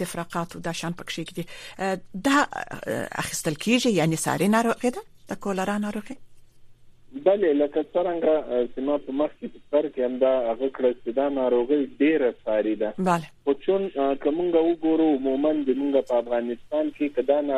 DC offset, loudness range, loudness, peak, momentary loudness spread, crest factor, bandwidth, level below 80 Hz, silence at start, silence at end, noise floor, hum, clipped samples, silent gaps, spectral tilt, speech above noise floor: under 0.1%; 3 LU; -25 LUFS; -6 dBFS; 10 LU; 18 dB; 15 kHz; -56 dBFS; 0 s; 0 s; -48 dBFS; none; under 0.1%; none; -5 dB/octave; 24 dB